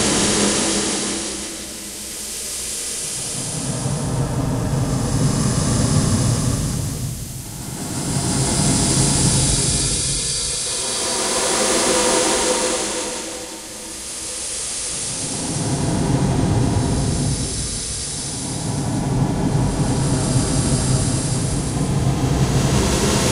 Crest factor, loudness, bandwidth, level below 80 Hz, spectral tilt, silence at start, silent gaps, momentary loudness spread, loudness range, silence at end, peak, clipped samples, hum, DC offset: 16 dB; -19 LUFS; 16 kHz; -32 dBFS; -4 dB/octave; 0 s; none; 10 LU; 6 LU; 0 s; -4 dBFS; under 0.1%; none; under 0.1%